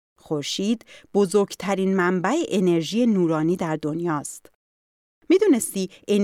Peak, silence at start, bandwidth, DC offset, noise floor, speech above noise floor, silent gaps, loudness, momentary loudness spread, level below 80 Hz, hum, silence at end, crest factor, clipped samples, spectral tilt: -8 dBFS; 0.3 s; 16 kHz; under 0.1%; under -90 dBFS; over 68 dB; 4.55-5.22 s; -22 LUFS; 9 LU; -68 dBFS; none; 0 s; 14 dB; under 0.1%; -5.5 dB/octave